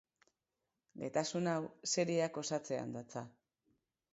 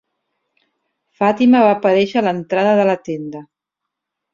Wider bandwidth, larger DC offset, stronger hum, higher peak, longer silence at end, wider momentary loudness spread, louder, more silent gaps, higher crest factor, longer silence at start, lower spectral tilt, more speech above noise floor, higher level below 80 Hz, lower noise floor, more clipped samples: first, 8 kHz vs 7.2 kHz; neither; neither; second, -20 dBFS vs -2 dBFS; about the same, 0.85 s vs 0.9 s; about the same, 13 LU vs 15 LU; second, -38 LUFS vs -15 LUFS; neither; about the same, 20 dB vs 16 dB; second, 0.95 s vs 1.2 s; second, -4.5 dB/octave vs -7 dB/octave; second, 51 dB vs 66 dB; second, -82 dBFS vs -62 dBFS; first, -89 dBFS vs -81 dBFS; neither